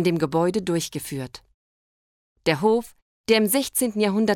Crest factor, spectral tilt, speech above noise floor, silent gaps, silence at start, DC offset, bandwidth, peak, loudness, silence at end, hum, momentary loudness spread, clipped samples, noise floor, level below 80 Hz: 18 dB; -4.5 dB/octave; over 68 dB; 1.54-2.36 s, 3.02-3.24 s; 0 s; under 0.1%; 18.5 kHz; -6 dBFS; -23 LUFS; 0 s; none; 12 LU; under 0.1%; under -90 dBFS; -58 dBFS